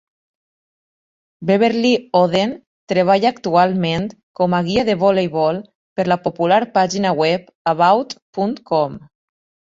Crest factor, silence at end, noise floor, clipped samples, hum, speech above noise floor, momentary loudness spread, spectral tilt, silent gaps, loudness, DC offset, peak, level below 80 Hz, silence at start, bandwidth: 16 dB; 0.75 s; under -90 dBFS; under 0.1%; none; over 73 dB; 9 LU; -6 dB/octave; 2.67-2.87 s, 4.23-4.34 s, 5.75-5.96 s, 7.55-7.65 s, 8.22-8.33 s; -17 LUFS; under 0.1%; -2 dBFS; -54 dBFS; 1.4 s; 7.8 kHz